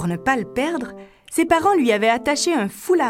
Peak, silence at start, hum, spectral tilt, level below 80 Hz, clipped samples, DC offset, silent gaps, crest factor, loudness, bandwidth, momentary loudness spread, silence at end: -4 dBFS; 0 s; none; -4 dB/octave; -52 dBFS; under 0.1%; under 0.1%; none; 16 dB; -19 LUFS; 16.5 kHz; 9 LU; 0 s